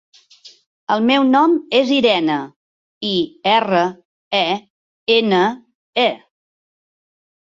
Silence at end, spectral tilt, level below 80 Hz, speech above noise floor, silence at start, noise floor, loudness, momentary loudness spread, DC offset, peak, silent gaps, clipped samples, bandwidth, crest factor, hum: 1.4 s; -5.5 dB/octave; -64 dBFS; 31 dB; 0.45 s; -46 dBFS; -17 LUFS; 12 LU; under 0.1%; -2 dBFS; 0.66-0.87 s, 2.56-3.01 s, 4.05-4.31 s, 4.70-5.07 s, 5.75-5.93 s; under 0.1%; 7.6 kHz; 16 dB; none